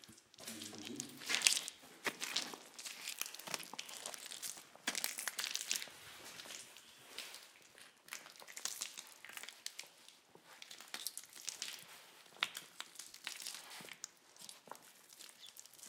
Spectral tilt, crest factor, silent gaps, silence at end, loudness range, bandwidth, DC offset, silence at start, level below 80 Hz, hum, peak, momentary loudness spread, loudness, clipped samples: 1 dB/octave; 40 dB; none; 0 s; 10 LU; 18 kHz; under 0.1%; 0 s; under -90 dBFS; none; -6 dBFS; 17 LU; -43 LUFS; under 0.1%